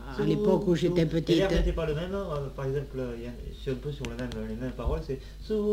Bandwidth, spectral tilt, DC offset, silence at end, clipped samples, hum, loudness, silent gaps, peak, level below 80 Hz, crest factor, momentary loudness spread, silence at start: 16 kHz; -7 dB/octave; under 0.1%; 0 s; under 0.1%; none; -30 LUFS; none; -10 dBFS; -38 dBFS; 18 dB; 11 LU; 0 s